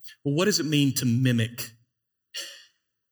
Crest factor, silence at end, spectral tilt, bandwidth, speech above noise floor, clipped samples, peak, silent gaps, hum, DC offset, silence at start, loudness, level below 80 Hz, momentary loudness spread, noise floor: 16 dB; 0.55 s; -4.5 dB/octave; over 20 kHz; 52 dB; under 0.1%; -10 dBFS; none; none; under 0.1%; 0 s; -24 LUFS; -70 dBFS; 15 LU; -76 dBFS